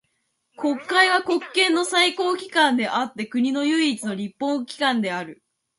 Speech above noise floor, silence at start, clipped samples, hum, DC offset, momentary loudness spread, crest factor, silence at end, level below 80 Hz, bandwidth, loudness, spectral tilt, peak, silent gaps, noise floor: 51 dB; 0.6 s; under 0.1%; none; under 0.1%; 10 LU; 18 dB; 0.45 s; -74 dBFS; 11.5 kHz; -21 LUFS; -3 dB/octave; -4 dBFS; none; -73 dBFS